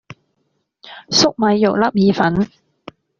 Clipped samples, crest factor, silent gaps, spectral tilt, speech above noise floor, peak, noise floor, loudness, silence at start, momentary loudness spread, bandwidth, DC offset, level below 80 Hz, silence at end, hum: under 0.1%; 16 dB; none; -4 dB/octave; 53 dB; -2 dBFS; -68 dBFS; -15 LUFS; 0.85 s; 5 LU; 7.4 kHz; under 0.1%; -52 dBFS; 0.75 s; none